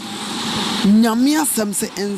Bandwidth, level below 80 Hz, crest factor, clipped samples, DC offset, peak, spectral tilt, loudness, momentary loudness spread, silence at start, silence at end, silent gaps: 15.5 kHz; -54 dBFS; 12 dB; under 0.1%; under 0.1%; -4 dBFS; -4 dB/octave; -17 LUFS; 8 LU; 0 s; 0 s; none